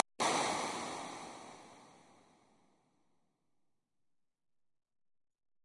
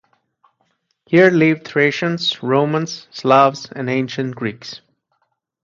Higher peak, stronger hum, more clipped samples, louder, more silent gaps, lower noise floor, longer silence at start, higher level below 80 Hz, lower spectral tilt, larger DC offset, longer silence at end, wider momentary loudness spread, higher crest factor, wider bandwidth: second, -8 dBFS vs 0 dBFS; neither; neither; second, -37 LUFS vs -17 LUFS; neither; first, -84 dBFS vs -69 dBFS; second, 0.2 s vs 1.1 s; second, -84 dBFS vs -64 dBFS; second, -2 dB/octave vs -6 dB/octave; neither; first, 3.7 s vs 0.9 s; first, 22 LU vs 14 LU; first, 34 dB vs 18 dB; first, 11.5 kHz vs 7.4 kHz